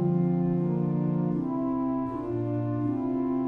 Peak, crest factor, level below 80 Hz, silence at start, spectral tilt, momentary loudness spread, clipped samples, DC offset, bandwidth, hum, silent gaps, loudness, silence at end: -16 dBFS; 12 dB; -56 dBFS; 0 s; -12.5 dB/octave; 4 LU; under 0.1%; under 0.1%; 3.1 kHz; none; none; -28 LUFS; 0 s